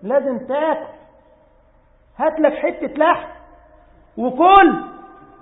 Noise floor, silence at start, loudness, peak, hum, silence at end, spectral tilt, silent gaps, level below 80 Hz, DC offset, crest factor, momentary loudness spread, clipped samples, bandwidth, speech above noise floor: -53 dBFS; 0.05 s; -17 LUFS; 0 dBFS; none; 0.35 s; -8.5 dB/octave; none; -50 dBFS; under 0.1%; 18 dB; 22 LU; under 0.1%; 4 kHz; 37 dB